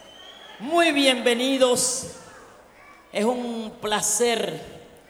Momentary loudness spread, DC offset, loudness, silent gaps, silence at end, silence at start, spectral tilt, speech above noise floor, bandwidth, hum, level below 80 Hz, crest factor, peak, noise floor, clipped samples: 23 LU; under 0.1%; -22 LUFS; none; 0.25 s; 0 s; -2 dB/octave; 27 dB; 18 kHz; none; -62 dBFS; 20 dB; -4 dBFS; -50 dBFS; under 0.1%